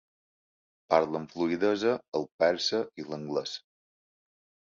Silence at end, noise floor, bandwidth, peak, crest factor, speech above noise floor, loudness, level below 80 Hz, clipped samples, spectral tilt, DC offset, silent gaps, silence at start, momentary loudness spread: 1.1 s; under -90 dBFS; 7.6 kHz; -8 dBFS; 24 dB; over 61 dB; -29 LUFS; -70 dBFS; under 0.1%; -4.5 dB/octave; under 0.1%; 2.08-2.12 s, 2.32-2.39 s; 0.9 s; 11 LU